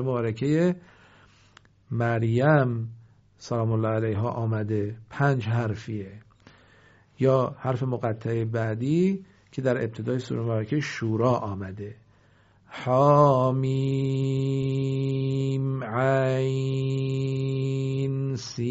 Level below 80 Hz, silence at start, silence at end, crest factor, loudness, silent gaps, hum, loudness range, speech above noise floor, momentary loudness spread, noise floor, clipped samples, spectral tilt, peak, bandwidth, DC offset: -60 dBFS; 0 s; 0 s; 20 dB; -26 LUFS; none; none; 5 LU; 34 dB; 12 LU; -59 dBFS; under 0.1%; -7.5 dB/octave; -6 dBFS; 7.8 kHz; under 0.1%